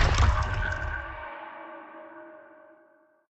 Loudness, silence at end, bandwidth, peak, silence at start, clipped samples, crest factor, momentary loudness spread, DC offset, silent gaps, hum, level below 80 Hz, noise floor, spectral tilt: -30 LUFS; 0.85 s; 8.2 kHz; -10 dBFS; 0 s; under 0.1%; 18 dB; 22 LU; under 0.1%; none; none; -32 dBFS; -62 dBFS; -5 dB/octave